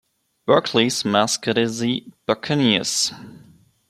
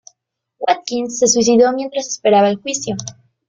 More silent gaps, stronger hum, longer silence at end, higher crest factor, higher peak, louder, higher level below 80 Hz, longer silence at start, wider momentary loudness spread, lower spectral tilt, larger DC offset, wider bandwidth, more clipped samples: neither; neither; first, 0.5 s vs 0.35 s; about the same, 20 dB vs 16 dB; about the same, -2 dBFS vs 0 dBFS; second, -20 LUFS vs -16 LUFS; about the same, -62 dBFS vs -58 dBFS; second, 0.45 s vs 0.6 s; second, 7 LU vs 12 LU; about the same, -3.5 dB/octave vs -3 dB/octave; neither; first, 14 kHz vs 9.6 kHz; neither